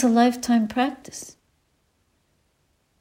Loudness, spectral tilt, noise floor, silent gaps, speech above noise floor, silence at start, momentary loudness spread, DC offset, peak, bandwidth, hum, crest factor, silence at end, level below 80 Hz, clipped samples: -22 LUFS; -4.5 dB/octave; -68 dBFS; none; 47 dB; 0 s; 19 LU; under 0.1%; -6 dBFS; 16 kHz; none; 18 dB; 1.7 s; -62 dBFS; under 0.1%